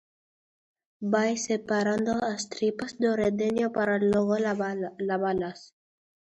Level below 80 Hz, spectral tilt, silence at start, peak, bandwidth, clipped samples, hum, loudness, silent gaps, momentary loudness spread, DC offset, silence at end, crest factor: -64 dBFS; -5 dB/octave; 1 s; -10 dBFS; 10 kHz; under 0.1%; none; -27 LUFS; none; 7 LU; under 0.1%; 0.55 s; 18 dB